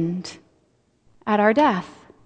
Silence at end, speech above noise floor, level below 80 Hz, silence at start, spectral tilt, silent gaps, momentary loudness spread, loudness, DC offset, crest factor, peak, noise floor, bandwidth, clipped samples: 0.35 s; 44 dB; -62 dBFS; 0 s; -6.5 dB/octave; none; 20 LU; -20 LUFS; under 0.1%; 20 dB; -4 dBFS; -64 dBFS; 9.2 kHz; under 0.1%